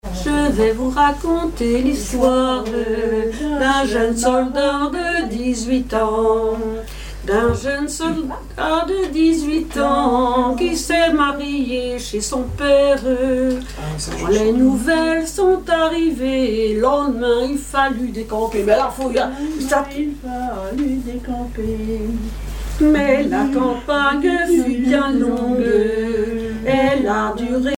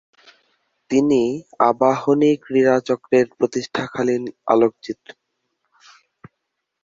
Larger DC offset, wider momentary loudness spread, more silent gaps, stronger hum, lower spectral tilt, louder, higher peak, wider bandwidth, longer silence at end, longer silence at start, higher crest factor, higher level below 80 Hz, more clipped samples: neither; about the same, 8 LU vs 8 LU; neither; first, 50 Hz at -35 dBFS vs none; about the same, -5 dB/octave vs -6 dB/octave; about the same, -18 LUFS vs -19 LUFS; about the same, -2 dBFS vs -2 dBFS; first, 17 kHz vs 7.6 kHz; second, 0 s vs 1.9 s; second, 0.05 s vs 0.9 s; about the same, 16 dB vs 18 dB; first, -32 dBFS vs -62 dBFS; neither